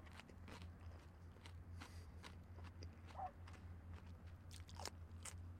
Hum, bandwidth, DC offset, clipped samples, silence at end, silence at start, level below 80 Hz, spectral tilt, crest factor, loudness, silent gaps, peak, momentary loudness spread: none; 16 kHz; under 0.1%; under 0.1%; 0 s; 0 s; -66 dBFS; -4.5 dB/octave; 26 dB; -57 LUFS; none; -30 dBFS; 6 LU